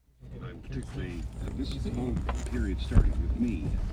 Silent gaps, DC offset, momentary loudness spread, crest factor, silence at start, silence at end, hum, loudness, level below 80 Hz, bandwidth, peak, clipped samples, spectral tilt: none; under 0.1%; 14 LU; 22 dB; 0.2 s; 0 s; none; -32 LUFS; -32 dBFS; 10.5 kHz; -8 dBFS; under 0.1%; -7.5 dB/octave